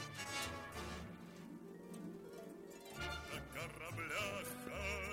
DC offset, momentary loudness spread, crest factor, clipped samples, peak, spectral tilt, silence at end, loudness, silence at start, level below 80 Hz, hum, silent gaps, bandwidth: under 0.1%; 12 LU; 18 dB; under 0.1%; -30 dBFS; -3.5 dB/octave; 0 s; -47 LUFS; 0 s; -60 dBFS; none; none; 16.5 kHz